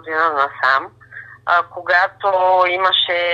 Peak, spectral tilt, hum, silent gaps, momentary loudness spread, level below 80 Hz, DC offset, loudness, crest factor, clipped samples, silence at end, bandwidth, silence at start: -2 dBFS; -3.5 dB/octave; none; none; 14 LU; -64 dBFS; under 0.1%; -16 LUFS; 16 dB; under 0.1%; 0 s; 7.6 kHz; 0.05 s